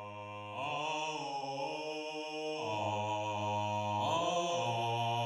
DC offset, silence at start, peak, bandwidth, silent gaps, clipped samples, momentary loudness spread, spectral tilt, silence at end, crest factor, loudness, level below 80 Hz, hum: under 0.1%; 0 s; -20 dBFS; 13 kHz; none; under 0.1%; 7 LU; -4.5 dB/octave; 0 s; 16 dB; -36 LUFS; -84 dBFS; none